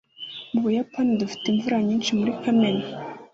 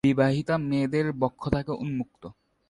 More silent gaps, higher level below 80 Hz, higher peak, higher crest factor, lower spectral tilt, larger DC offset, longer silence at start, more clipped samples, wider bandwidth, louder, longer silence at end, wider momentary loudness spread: neither; second, -64 dBFS vs -48 dBFS; about the same, -10 dBFS vs -8 dBFS; about the same, 14 dB vs 18 dB; second, -5.5 dB/octave vs -8 dB/octave; neither; first, 0.2 s vs 0.05 s; neither; second, 7.8 kHz vs 11 kHz; first, -24 LUFS vs -27 LUFS; second, 0.1 s vs 0.35 s; about the same, 13 LU vs 14 LU